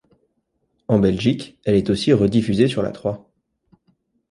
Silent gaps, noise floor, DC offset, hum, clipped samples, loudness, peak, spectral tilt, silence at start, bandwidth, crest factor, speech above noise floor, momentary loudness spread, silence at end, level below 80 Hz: none; -70 dBFS; under 0.1%; none; under 0.1%; -19 LUFS; -2 dBFS; -7 dB/octave; 0.9 s; 11 kHz; 18 dB; 52 dB; 11 LU; 1.15 s; -46 dBFS